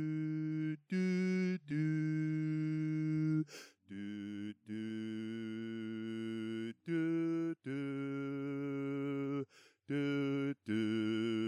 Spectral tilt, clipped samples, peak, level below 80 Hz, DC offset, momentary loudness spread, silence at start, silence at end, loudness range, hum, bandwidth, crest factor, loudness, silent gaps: -8 dB/octave; under 0.1%; -26 dBFS; -84 dBFS; under 0.1%; 9 LU; 0 s; 0 s; 5 LU; none; 10.5 kHz; 12 dB; -38 LUFS; none